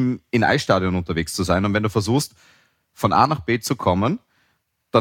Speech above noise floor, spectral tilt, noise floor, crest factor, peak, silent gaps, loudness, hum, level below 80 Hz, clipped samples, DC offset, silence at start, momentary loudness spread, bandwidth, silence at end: 48 dB; -5.5 dB/octave; -68 dBFS; 18 dB; -2 dBFS; none; -21 LUFS; none; -46 dBFS; under 0.1%; under 0.1%; 0 s; 7 LU; 17.5 kHz; 0 s